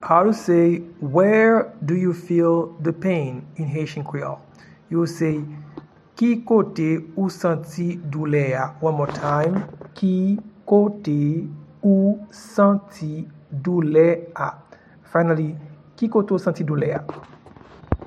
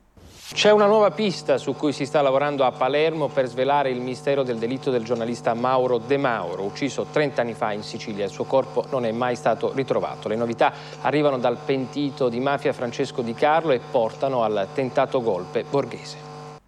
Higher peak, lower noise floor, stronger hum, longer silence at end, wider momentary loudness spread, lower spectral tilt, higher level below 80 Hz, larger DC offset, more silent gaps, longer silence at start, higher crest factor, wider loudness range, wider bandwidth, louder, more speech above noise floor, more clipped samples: first, -2 dBFS vs -6 dBFS; about the same, -45 dBFS vs -45 dBFS; neither; about the same, 0 s vs 0.1 s; first, 13 LU vs 7 LU; first, -8.5 dB/octave vs -5.5 dB/octave; first, -52 dBFS vs -62 dBFS; neither; neither; second, 0 s vs 0.25 s; about the same, 18 dB vs 16 dB; about the same, 4 LU vs 4 LU; about the same, 12 kHz vs 12 kHz; about the same, -21 LUFS vs -23 LUFS; about the same, 25 dB vs 22 dB; neither